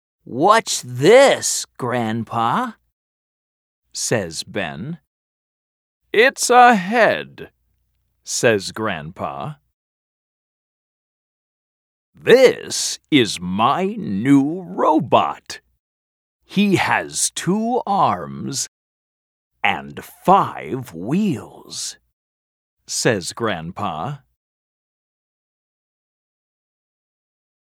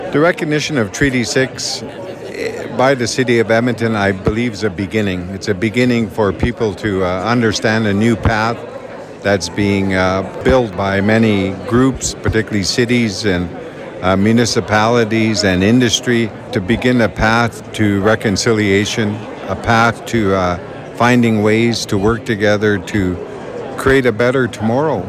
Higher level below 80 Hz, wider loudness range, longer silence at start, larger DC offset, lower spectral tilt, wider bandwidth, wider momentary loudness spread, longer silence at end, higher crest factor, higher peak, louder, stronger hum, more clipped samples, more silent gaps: second, -60 dBFS vs -36 dBFS; first, 10 LU vs 2 LU; first, 0.3 s vs 0 s; neither; about the same, -4 dB/octave vs -5 dB/octave; first, 17 kHz vs 14.5 kHz; first, 16 LU vs 9 LU; first, 3.55 s vs 0 s; first, 20 dB vs 14 dB; about the same, 0 dBFS vs -2 dBFS; second, -18 LUFS vs -15 LUFS; neither; neither; first, 2.92-3.82 s, 5.07-6.01 s, 9.73-12.13 s, 15.79-16.40 s, 18.68-19.51 s, 22.13-22.77 s vs none